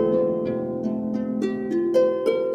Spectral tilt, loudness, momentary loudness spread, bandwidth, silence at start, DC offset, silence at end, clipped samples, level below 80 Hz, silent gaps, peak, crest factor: -8 dB/octave; -24 LUFS; 6 LU; 10 kHz; 0 s; under 0.1%; 0 s; under 0.1%; -60 dBFS; none; -8 dBFS; 14 dB